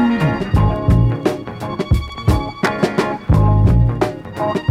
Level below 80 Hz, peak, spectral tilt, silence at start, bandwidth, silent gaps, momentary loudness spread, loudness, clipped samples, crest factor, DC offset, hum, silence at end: -22 dBFS; -2 dBFS; -8 dB/octave; 0 s; 13.5 kHz; none; 8 LU; -17 LUFS; under 0.1%; 14 dB; under 0.1%; none; 0 s